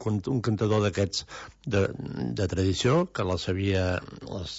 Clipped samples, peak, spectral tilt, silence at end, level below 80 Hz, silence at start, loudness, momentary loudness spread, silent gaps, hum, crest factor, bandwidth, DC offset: under 0.1%; -12 dBFS; -6 dB/octave; 0 s; -50 dBFS; 0 s; -27 LUFS; 9 LU; none; none; 14 dB; 8 kHz; under 0.1%